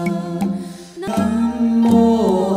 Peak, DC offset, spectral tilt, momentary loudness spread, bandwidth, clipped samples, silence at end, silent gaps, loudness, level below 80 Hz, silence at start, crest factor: -4 dBFS; under 0.1%; -7.5 dB/octave; 14 LU; 13.5 kHz; under 0.1%; 0 s; none; -17 LUFS; -46 dBFS; 0 s; 14 dB